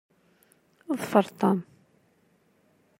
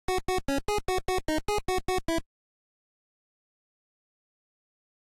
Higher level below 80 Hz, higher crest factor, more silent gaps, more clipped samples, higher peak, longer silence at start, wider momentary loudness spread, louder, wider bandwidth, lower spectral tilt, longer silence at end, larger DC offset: second, -80 dBFS vs -42 dBFS; first, 26 dB vs 14 dB; neither; neither; first, -4 dBFS vs -18 dBFS; first, 0.9 s vs 0.1 s; first, 9 LU vs 0 LU; first, -26 LUFS vs -30 LUFS; about the same, 16 kHz vs 16 kHz; first, -7 dB/octave vs -4 dB/octave; second, 1.4 s vs 2.95 s; neither